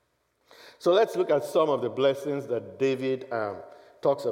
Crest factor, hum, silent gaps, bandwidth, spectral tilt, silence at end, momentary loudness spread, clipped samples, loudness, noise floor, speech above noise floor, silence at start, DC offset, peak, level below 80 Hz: 16 dB; none; none; 16.5 kHz; -6 dB/octave; 0 s; 9 LU; under 0.1%; -27 LUFS; -70 dBFS; 44 dB; 0.6 s; under 0.1%; -10 dBFS; -82 dBFS